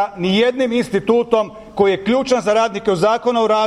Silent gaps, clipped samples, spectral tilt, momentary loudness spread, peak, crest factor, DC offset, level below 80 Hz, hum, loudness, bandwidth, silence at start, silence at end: none; under 0.1%; -5 dB/octave; 3 LU; -2 dBFS; 14 dB; under 0.1%; -50 dBFS; none; -17 LUFS; 12 kHz; 0 s; 0 s